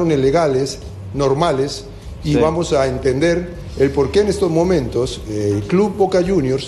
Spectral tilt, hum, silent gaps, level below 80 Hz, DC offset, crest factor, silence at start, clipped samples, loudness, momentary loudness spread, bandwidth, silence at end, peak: -6 dB/octave; none; none; -34 dBFS; under 0.1%; 16 dB; 0 s; under 0.1%; -17 LUFS; 9 LU; 12.5 kHz; 0 s; -2 dBFS